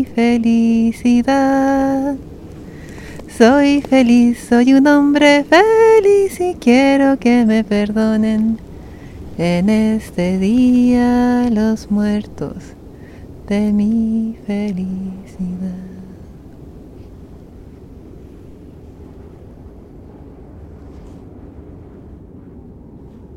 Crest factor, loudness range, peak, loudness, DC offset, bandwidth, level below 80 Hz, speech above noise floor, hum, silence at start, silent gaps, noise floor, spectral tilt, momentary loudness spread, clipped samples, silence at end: 16 dB; 13 LU; 0 dBFS; -14 LUFS; 0.2%; 13 kHz; -40 dBFS; 24 dB; none; 0 s; none; -37 dBFS; -6 dB/octave; 22 LU; under 0.1%; 0.05 s